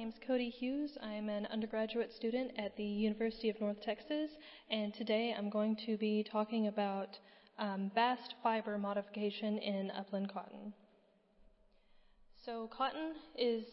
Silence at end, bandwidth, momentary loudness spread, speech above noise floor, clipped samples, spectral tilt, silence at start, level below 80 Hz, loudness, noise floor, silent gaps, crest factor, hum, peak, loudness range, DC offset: 0 s; 5.6 kHz; 9 LU; 33 dB; under 0.1%; -4 dB/octave; 0 s; -72 dBFS; -39 LUFS; -71 dBFS; none; 18 dB; none; -20 dBFS; 7 LU; under 0.1%